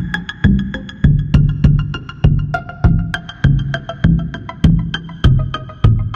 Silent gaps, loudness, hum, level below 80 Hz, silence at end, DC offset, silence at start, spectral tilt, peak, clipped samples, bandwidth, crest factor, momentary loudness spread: none; -16 LUFS; none; -20 dBFS; 0 s; under 0.1%; 0 s; -8 dB/octave; 0 dBFS; under 0.1%; 7.2 kHz; 14 dB; 9 LU